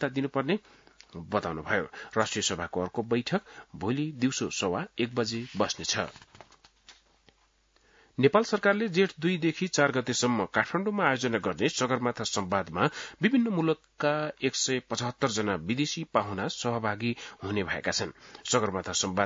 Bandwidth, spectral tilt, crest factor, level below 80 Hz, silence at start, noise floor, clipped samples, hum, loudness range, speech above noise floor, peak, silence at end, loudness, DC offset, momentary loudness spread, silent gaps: 7.8 kHz; -4 dB/octave; 22 dB; -66 dBFS; 0 s; -67 dBFS; under 0.1%; none; 5 LU; 38 dB; -8 dBFS; 0 s; -29 LUFS; under 0.1%; 7 LU; none